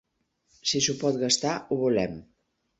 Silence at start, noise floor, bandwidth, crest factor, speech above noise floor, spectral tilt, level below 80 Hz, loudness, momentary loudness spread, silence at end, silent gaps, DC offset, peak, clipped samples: 0.65 s; -72 dBFS; 8.4 kHz; 20 dB; 46 dB; -3 dB/octave; -60 dBFS; -26 LUFS; 8 LU; 0.55 s; none; under 0.1%; -8 dBFS; under 0.1%